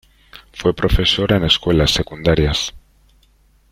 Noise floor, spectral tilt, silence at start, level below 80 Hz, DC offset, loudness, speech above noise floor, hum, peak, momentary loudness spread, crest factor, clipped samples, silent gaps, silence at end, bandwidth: -54 dBFS; -5 dB/octave; 0.35 s; -28 dBFS; under 0.1%; -16 LUFS; 38 dB; none; -2 dBFS; 7 LU; 18 dB; under 0.1%; none; 0.95 s; 16 kHz